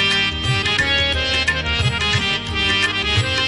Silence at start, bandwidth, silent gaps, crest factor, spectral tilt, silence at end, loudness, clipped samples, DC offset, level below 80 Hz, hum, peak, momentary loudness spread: 0 s; 11.5 kHz; none; 12 dB; -3.5 dB/octave; 0 s; -17 LUFS; under 0.1%; under 0.1%; -34 dBFS; none; -6 dBFS; 3 LU